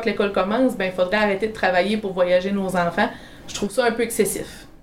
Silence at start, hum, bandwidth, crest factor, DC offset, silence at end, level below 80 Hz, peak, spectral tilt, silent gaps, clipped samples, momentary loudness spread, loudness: 0 s; none; 16.5 kHz; 16 dB; 0.3%; 0.05 s; -46 dBFS; -6 dBFS; -4.5 dB/octave; none; under 0.1%; 7 LU; -21 LUFS